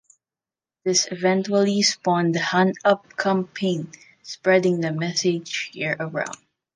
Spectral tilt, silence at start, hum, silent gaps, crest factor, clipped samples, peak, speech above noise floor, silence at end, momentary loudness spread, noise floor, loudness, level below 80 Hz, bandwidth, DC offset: -4 dB/octave; 0.85 s; none; none; 20 dB; under 0.1%; -4 dBFS; over 68 dB; 0.4 s; 10 LU; under -90 dBFS; -22 LUFS; -72 dBFS; 10 kHz; under 0.1%